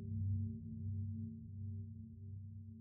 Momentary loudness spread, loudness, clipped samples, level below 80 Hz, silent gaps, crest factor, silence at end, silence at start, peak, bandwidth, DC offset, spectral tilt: 11 LU; -46 LUFS; under 0.1%; -62 dBFS; none; 12 dB; 0 s; 0 s; -32 dBFS; 0.6 kHz; under 0.1%; -17 dB/octave